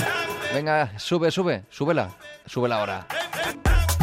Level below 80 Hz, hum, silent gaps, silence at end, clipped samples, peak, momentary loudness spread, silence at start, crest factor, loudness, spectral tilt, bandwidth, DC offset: -32 dBFS; none; none; 0 s; under 0.1%; -8 dBFS; 6 LU; 0 s; 16 dB; -25 LUFS; -5 dB/octave; 16 kHz; under 0.1%